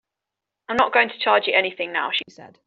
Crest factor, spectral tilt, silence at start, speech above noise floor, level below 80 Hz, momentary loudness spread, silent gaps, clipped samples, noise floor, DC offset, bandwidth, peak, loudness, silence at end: 20 dB; 1 dB/octave; 0.7 s; 63 dB; -66 dBFS; 9 LU; none; under 0.1%; -85 dBFS; under 0.1%; 7.6 kHz; -2 dBFS; -20 LUFS; 0.2 s